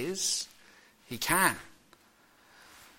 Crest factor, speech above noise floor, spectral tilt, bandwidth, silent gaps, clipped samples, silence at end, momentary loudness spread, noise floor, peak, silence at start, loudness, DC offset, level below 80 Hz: 26 dB; 33 dB; -1.5 dB/octave; 16.5 kHz; none; under 0.1%; 0.15 s; 17 LU; -63 dBFS; -10 dBFS; 0 s; -29 LUFS; under 0.1%; -60 dBFS